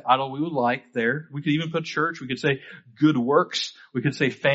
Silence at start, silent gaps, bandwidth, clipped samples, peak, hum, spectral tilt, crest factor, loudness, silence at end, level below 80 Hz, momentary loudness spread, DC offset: 0.05 s; none; 8 kHz; under 0.1%; -4 dBFS; none; -4 dB/octave; 20 dB; -24 LUFS; 0 s; -66 dBFS; 7 LU; under 0.1%